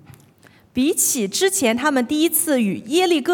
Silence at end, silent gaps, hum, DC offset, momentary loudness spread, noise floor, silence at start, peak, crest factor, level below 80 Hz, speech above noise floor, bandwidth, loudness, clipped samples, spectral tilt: 0 s; none; none; under 0.1%; 3 LU; -52 dBFS; 0.75 s; -4 dBFS; 14 dB; -60 dBFS; 33 dB; 18 kHz; -18 LUFS; under 0.1%; -2.5 dB/octave